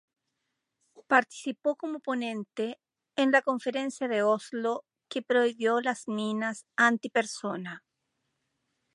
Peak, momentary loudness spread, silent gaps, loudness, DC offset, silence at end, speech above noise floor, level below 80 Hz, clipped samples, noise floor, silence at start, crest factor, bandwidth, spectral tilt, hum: -8 dBFS; 13 LU; none; -29 LUFS; under 0.1%; 1.15 s; 54 dB; -86 dBFS; under 0.1%; -83 dBFS; 1.1 s; 22 dB; 11.5 kHz; -4 dB/octave; none